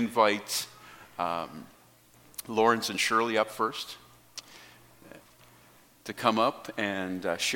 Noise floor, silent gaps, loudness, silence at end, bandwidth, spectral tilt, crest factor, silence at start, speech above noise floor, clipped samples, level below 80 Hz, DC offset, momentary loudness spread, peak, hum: -59 dBFS; none; -28 LUFS; 0 s; 17.5 kHz; -3 dB/octave; 24 dB; 0 s; 30 dB; under 0.1%; -72 dBFS; under 0.1%; 20 LU; -6 dBFS; none